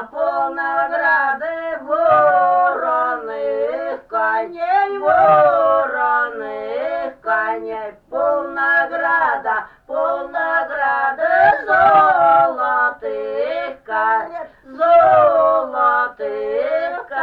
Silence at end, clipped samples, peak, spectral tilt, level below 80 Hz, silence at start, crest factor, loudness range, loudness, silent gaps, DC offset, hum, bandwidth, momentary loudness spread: 0 s; under 0.1%; -2 dBFS; -6.5 dB/octave; -56 dBFS; 0 s; 14 dB; 4 LU; -17 LUFS; none; under 0.1%; none; 5 kHz; 12 LU